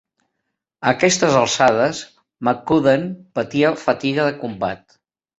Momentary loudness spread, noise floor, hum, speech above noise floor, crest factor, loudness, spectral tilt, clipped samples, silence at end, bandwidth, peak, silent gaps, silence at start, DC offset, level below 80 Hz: 11 LU; -77 dBFS; none; 59 dB; 18 dB; -18 LUFS; -4 dB/octave; under 0.1%; 0.65 s; 8.2 kHz; -2 dBFS; none; 0.8 s; under 0.1%; -56 dBFS